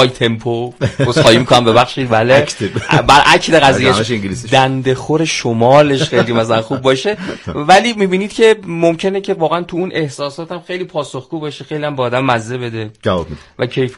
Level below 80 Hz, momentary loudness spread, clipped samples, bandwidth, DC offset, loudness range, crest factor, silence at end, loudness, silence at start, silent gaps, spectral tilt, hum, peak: -42 dBFS; 14 LU; 0.2%; 14 kHz; under 0.1%; 9 LU; 12 dB; 0 s; -13 LUFS; 0 s; none; -5 dB/octave; none; 0 dBFS